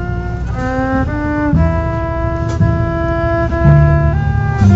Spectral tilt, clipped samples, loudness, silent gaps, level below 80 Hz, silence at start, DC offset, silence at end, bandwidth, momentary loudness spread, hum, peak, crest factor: -9 dB/octave; under 0.1%; -15 LUFS; none; -20 dBFS; 0 s; under 0.1%; 0 s; 7.6 kHz; 8 LU; none; 0 dBFS; 12 dB